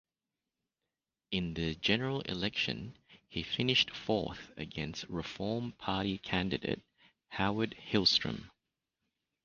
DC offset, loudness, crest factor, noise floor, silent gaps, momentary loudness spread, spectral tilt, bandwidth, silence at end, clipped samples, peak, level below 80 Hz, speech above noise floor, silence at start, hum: under 0.1%; -34 LUFS; 24 dB; under -90 dBFS; none; 13 LU; -3 dB/octave; 7.2 kHz; 0.95 s; under 0.1%; -12 dBFS; -58 dBFS; over 55 dB; 1.3 s; none